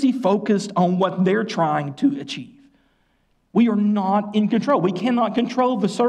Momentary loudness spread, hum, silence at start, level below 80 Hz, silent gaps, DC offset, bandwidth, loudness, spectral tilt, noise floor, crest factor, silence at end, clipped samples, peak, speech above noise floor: 3 LU; none; 0 s; -68 dBFS; none; under 0.1%; 10 kHz; -20 LUFS; -7 dB/octave; -64 dBFS; 12 dB; 0 s; under 0.1%; -8 dBFS; 45 dB